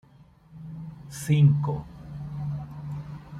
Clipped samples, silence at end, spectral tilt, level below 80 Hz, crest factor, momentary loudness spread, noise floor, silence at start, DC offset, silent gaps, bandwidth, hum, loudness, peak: under 0.1%; 0 s; -7.5 dB/octave; -52 dBFS; 18 dB; 21 LU; -55 dBFS; 0.2 s; under 0.1%; none; 13 kHz; none; -27 LUFS; -8 dBFS